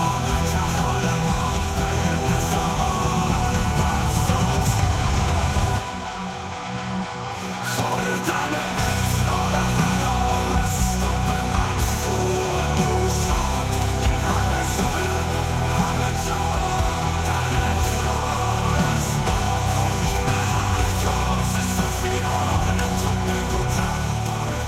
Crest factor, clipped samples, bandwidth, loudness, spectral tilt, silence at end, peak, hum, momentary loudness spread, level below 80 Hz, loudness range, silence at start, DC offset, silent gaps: 16 dB; under 0.1%; 16.5 kHz; -22 LUFS; -5 dB/octave; 0 s; -4 dBFS; none; 3 LU; -30 dBFS; 2 LU; 0 s; under 0.1%; none